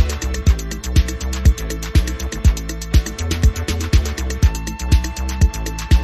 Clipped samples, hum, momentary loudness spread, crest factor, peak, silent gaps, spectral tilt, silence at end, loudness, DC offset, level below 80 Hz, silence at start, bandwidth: under 0.1%; none; 5 LU; 16 dB; -2 dBFS; none; -5 dB/octave; 0 s; -19 LUFS; under 0.1%; -18 dBFS; 0 s; 14 kHz